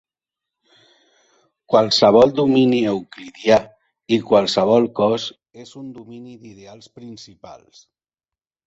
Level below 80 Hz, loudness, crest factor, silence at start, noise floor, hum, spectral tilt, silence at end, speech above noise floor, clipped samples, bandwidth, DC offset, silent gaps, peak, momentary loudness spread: -58 dBFS; -16 LUFS; 18 dB; 1.7 s; under -90 dBFS; none; -5.5 dB/octave; 1.1 s; over 72 dB; under 0.1%; 8 kHz; under 0.1%; none; -2 dBFS; 25 LU